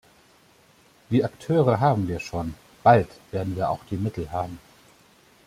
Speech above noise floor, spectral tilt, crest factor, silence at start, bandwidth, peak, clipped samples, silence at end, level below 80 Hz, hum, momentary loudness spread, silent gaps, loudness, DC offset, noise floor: 34 dB; -8 dB/octave; 22 dB; 1.1 s; 15 kHz; -4 dBFS; under 0.1%; 0.9 s; -52 dBFS; none; 13 LU; none; -24 LUFS; under 0.1%; -57 dBFS